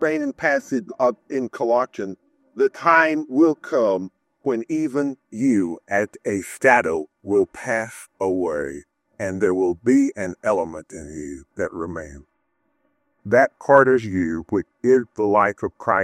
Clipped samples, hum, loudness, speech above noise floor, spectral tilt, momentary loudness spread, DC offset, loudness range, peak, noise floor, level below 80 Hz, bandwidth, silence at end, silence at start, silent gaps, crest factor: under 0.1%; none; -21 LUFS; 50 dB; -6 dB/octave; 16 LU; under 0.1%; 4 LU; 0 dBFS; -71 dBFS; -58 dBFS; 13 kHz; 0 s; 0 s; none; 20 dB